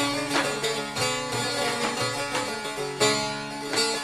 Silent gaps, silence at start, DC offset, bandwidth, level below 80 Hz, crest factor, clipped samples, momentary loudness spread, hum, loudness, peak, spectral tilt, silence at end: none; 0 s; under 0.1%; 16 kHz; -56 dBFS; 20 dB; under 0.1%; 7 LU; none; -26 LUFS; -8 dBFS; -2.5 dB/octave; 0 s